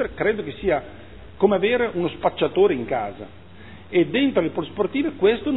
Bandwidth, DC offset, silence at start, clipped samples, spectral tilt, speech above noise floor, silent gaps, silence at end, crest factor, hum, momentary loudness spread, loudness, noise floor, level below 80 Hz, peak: 4.1 kHz; 0.5%; 0 s; under 0.1%; -9.5 dB/octave; 22 dB; none; 0 s; 20 dB; none; 8 LU; -22 LUFS; -43 dBFS; -50 dBFS; -2 dBFS